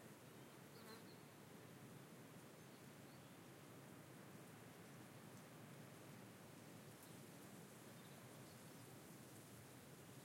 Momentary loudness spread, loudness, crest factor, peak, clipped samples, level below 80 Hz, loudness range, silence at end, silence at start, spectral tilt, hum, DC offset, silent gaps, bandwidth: 2 LU; -61 LUFS; 14 dB; -46 dBFS; under 0.1%; under -90 dBFS; 1 LU; 0 s; 0 s; -4.5 dB/octave; none; under 0.1%; none; 16.5 kHz